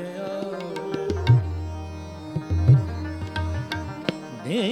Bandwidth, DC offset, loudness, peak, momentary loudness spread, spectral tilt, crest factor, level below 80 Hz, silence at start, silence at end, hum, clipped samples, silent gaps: 10 kHz; under 0.1%; -25 LUFS; -4 dBFS; 14 LU; -7.5 dB/octave; 20 dB; -40 dBFS; 0 s; 0 s; none; under 0.1%; none